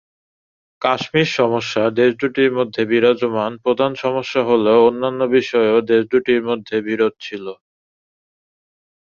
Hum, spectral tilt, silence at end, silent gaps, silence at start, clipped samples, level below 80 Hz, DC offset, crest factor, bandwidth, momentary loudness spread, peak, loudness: none; -6 dB/octave; 1.55 s; none; 0.8 s; under 0.1%; -60 dBFS; under 0.1%; 16 dB; 7.2 kHz; 7 LU; -2 dBFS; -17 LUFS